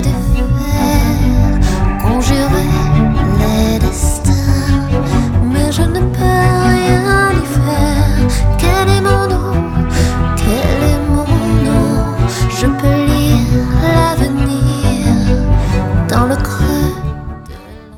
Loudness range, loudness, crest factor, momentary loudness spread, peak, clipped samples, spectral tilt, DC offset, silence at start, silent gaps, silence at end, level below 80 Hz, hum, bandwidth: 1 LU; -13 LUFS; 12 dB; 4 LU; 0 dBFS; under 0.1%; -6 dB/octave; under 0.1%; 0 s; none; 0 s; -18 dBFS; none; 17.5 kHz